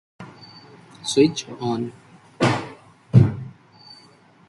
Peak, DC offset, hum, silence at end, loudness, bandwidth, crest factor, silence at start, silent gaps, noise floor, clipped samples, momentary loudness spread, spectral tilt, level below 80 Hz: 0 dBFS; under 0.1%; none; 1 s; -21 LUFS; 11.5 kHz; 22 dB; 0.2 s; none; -52 dBFS; under 0.1%; 25 LU; -6 dB/octave; -52 dBFS